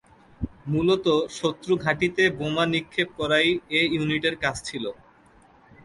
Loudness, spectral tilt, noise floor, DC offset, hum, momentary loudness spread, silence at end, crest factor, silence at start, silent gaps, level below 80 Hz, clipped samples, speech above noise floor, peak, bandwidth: -24 LUFS; -5 dB/octave; -55 dBFS; under 0.1%; none; 11 LU; 0.9 s; 18 dB; 0.4 s; none; -50 dBFS; under 0.1%; 31 dB; -6 dBFS; 11.5 kHz